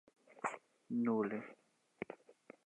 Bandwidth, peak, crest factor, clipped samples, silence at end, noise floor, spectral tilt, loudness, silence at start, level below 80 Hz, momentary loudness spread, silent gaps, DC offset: 9 kHz; -24 dBFS; 18 dB; under 0.1%; 0.35 s; -63 dBFS; -7 dB/octave; -41 LUFS; 0.3 s; -88 dBFS; 20 LU; none; under 0.1%